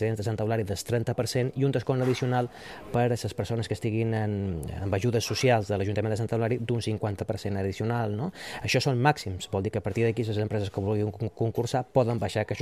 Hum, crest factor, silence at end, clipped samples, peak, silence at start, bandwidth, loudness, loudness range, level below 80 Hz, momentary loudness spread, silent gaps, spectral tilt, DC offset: none; 18 dB; 0 s; under 0.1%; -8 dBFS; 0 s; 14 kHz; -28 LUFS; 1 LU; -54 dBFS; 6 LU; none; -6 dB/octave; under 0.1%